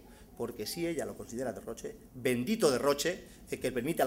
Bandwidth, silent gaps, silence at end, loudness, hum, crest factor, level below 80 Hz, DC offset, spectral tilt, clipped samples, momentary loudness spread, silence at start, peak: 16 kHz; none; 0 s; -34 LUFS; none; 22 dB; -60 dBFS; under 0.1%; -4 dB/octave; under 0.1%; 14 LU; 0 s; -12 dBFS